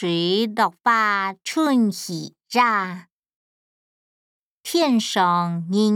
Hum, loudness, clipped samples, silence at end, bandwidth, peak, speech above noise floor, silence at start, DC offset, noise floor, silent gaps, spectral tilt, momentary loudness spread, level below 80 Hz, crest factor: none; -21 LUFS; under 0.1%; 0 s; 17.5 kHz; -6 dBFS; over 70 dB; 0 s; under 0.1%; under -90 dBFS; 3.12-3.17 s, 3.36-4.61 s; -4.5 dB/octave; 12 LU; -80 dBFS; 16 dB